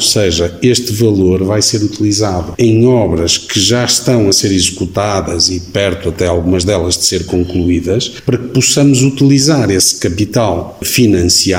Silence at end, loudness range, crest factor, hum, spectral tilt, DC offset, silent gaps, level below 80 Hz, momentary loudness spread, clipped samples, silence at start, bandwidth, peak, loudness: 0 s; 2 LU; 12 dB; none; -4 dB/octave; 0.3%; none; -34 dBFS; 6 LU; under 0.1%; 0 s; 16.5 kHz; 0 dBFS; -11 LUFS